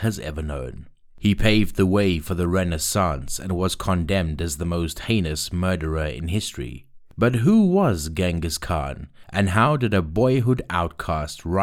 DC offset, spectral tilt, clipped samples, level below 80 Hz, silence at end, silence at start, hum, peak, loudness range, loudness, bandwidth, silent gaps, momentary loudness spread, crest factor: under 0.1%; -5.5 dB/octave; under 0.1%; -36 dBFS; 0 s; 0 s; none; -6 dBFS; 3 LU; -22 LUFS; 17 kHz; none; 10 LU; 16 dB